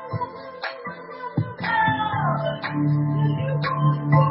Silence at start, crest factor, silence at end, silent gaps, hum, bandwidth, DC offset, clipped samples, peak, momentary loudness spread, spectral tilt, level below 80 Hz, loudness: 0 s; 18 dB; 0 s; none; none; 5.8 kHz; under 0.1%; under 0.1%; -6 dBFS; 12 LU; -12 dB/octave; -54 dBFS; -23 LUFS